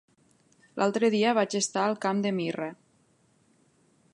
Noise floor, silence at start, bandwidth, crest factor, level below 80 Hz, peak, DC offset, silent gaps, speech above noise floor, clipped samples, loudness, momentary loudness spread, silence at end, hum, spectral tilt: -66 dBFS; 0.75 s; 11.5 kHz; 18 dB; -80 dBFS; -10 dBFS; under 0.1%; none; 40 dB; under 0.1%; -27 LUFS; 11 LU; 1.4 s; none; -4.5 dB/octave